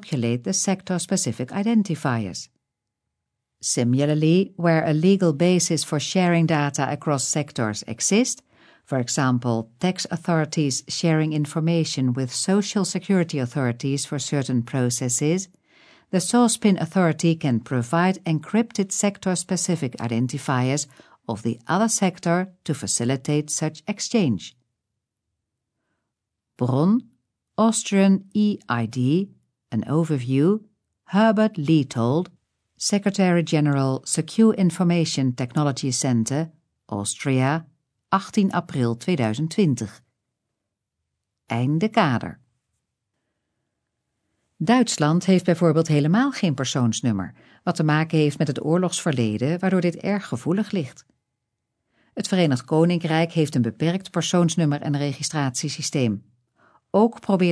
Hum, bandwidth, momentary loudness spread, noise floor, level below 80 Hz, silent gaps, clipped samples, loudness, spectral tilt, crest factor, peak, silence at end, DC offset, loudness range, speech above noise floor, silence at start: none; 11 kHz; 8 LU; -82 dBFS; -68 dBFS; none; under 0.1%; -22 LUFS; -5.5 dB/octave; 18 dB; -6 dBFS; 0 s; under 0.1%; 5 LU; 61 dB; 0 s